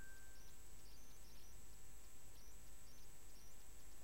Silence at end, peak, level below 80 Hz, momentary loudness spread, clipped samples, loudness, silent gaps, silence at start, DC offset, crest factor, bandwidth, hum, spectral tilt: 0 s; -42 dBFS; -64 dBFS; 1 LU; under 0.1%; -63 LUFS; none; 0 s; 0.4%; 14 dB; 16 kHz; none; -2.5 dB/octave